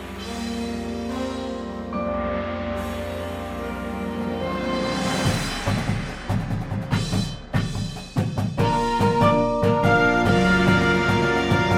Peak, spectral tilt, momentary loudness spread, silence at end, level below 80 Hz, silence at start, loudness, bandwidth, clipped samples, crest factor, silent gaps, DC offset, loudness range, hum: -4 dBFS; -6 dB/octave; 12 LU; 0 s; -38 dBFS; 0 s; -23 LUFS; 16 kHz; under 0.1%; 18 dB; none; under 0.1%; 9 LU; none